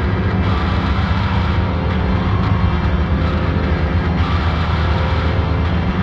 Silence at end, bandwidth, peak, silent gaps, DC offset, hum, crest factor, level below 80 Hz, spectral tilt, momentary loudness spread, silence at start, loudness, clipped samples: 0 s; 6.2 kHz; -4 dBFS; none; under 0.1%; none; 12 dB; -22 dBFS; -8 dB/octave; 1 LU; 0 s; -17 LUFS; under 0.1%